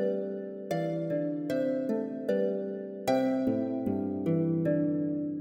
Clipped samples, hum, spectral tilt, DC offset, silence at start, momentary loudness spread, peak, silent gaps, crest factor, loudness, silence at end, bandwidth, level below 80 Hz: under 0.1%; none; -8 dB/octave; under 0.1%; 0 s; 7 LU; -14 dBFS; none; 16 dB; -31 LUFS; 0 s; 16.5 kHz; -68 dBFS